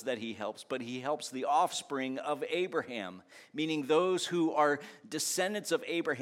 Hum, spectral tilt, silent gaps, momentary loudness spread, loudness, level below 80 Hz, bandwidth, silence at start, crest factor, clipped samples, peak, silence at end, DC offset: none; -3.5 dB/octave; none; 11 LU; -33 LUFS; -88 dBFS; 16.5 kHz; 0 s; 18 dB; under 0.1%; -14 dBFS; 0 s; under 0.1%